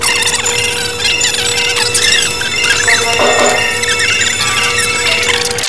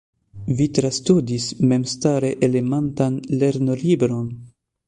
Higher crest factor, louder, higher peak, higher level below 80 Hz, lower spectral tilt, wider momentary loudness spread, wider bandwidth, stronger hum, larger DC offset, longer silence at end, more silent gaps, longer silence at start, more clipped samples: second, 12 dB vs 18 dB; first, -10 LUFS vs -20 LUFS; first, 0 dBFS vs -4 dBFS; first, -40 dBFS vs -52 dBFS; second, -0.5 dB/octave vs -6.5 dB/octave; second, 3 LU vs 7 LU; about the same, 11 kHz vs 11 kHz; neither; first, 3% vs under 0.1%; second, 0 s vs 0.4 s; neither; second, 0 s vs 0.35 s; neither